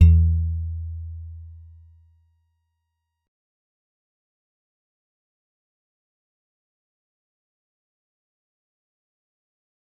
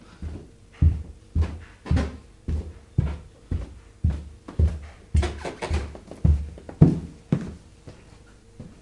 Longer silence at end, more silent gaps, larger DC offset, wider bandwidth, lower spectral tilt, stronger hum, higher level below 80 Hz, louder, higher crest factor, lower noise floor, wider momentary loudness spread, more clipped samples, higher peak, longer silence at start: first, 8.45 s vs 0.15 s; neither; neither; second, 2.9 kHz vs 10.5 kHz; first, -11 dB/octave vs -8 dB/octave; neither; about the same, -36 dBFS vs -32 dBFS; first, -23 LUFS vs -27 LUFS; about the same, 24 dB vs 26 dB; first, -79 dBFS vs -50 dBFS; first, 24 LU vs 17 LU; neither; second, -4 dBFS vs 0 dBFS; second, 0 s vs 0.2 s